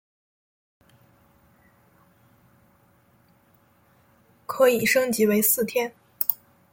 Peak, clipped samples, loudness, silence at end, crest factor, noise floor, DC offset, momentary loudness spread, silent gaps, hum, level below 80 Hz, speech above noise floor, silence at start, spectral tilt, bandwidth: -2 dBFS; under 0.1%; -22 LUFS; 0.4 s; 26 dB; -61 dBFS; under 0.1%; 16 LU; none; none; -68 dBFS; 40 dB; 4.5 s; -3.5 dB/octave; 17 kHz